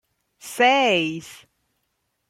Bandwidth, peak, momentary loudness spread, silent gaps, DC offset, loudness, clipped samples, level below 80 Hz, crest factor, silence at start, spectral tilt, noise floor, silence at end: 16 kHz; -4 dBFS; 19 LU; none; under 0.1%; -19 LUFS; under 0.1%; -70 dBFS; 20 dB; 0.45 s; -3.5 dB/octave; -74 dBFS; 0.95 s